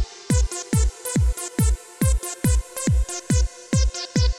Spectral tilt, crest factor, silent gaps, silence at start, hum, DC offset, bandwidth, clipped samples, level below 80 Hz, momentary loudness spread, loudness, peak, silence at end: -5 dB/octave; 14 dB; none; 0 s; none; under 0.1%; 15.5 kHz; under 0.1%; -24 dBFS; 1 LU; -23 LUFS; -8 dBFS; 0 s